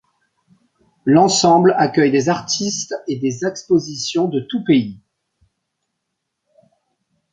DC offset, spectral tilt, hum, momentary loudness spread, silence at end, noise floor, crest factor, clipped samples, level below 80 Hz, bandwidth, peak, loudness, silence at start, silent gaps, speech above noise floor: under 0.1%; -4.5 dB/octave; none; 11 LU; 2.35 s; -76 dBFS; 18 dB; under 0.1%; -60 dBFS; 9.6 kHz; -2 dBFS; -17 LUFS; 1.05 s; none; 60 dB